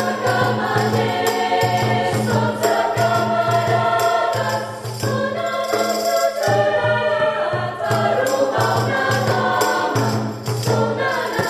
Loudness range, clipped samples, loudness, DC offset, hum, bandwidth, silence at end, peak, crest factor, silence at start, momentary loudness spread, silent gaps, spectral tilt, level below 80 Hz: 1 LU; under 0.1%; -19 LUFS; under 0.1%; none; 14 kHz; 0 s; -4 dBFS; 14 dB; 0 s; 4 LU; none; -5 dB/octave; -54 dBFS